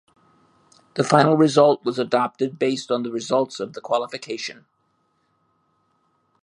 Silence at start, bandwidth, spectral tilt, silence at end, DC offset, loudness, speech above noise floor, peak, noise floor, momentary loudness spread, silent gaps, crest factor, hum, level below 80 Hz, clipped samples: 0.95 s; 11 kHz; -5.5 dB/octave; 1.9 s; under 0.1%; -21 LUFS; 48 dB; 0 dBFS; -68 dBFS; 14 LU; none; 22 dB; none; -72 dBFS; under 0.1%